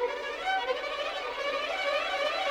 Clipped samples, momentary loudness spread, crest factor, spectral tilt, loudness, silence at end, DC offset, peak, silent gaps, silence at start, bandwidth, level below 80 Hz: under 0.1%; 4 LU; 14 dB; -1 dB/octave; -31 LUFS; 0 s; under 0.1%; -18 dBFS; none; 0 s; over 20 kHz; -62 dBFS